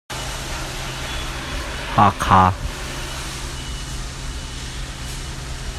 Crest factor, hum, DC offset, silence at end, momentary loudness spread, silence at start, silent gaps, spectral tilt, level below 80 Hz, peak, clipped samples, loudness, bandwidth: 22 dB; none; under 0.1%; 0 s; 15 LU; 0.1 s; none; -4 dB/octave; -32 dBFS; 0 dBFS; under 0.1%; -23 LUFS; 15.5 kHz